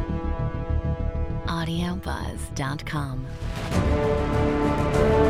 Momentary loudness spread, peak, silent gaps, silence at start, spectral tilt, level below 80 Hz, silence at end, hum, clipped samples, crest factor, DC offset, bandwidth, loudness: 9 LU; -6 dBFS; none; 0 s; -7 dB/octave; -30 dBFS; 0 s; none; under 0.1%; 18 dB; under 0.1%; 15 kHz; -26 LUFS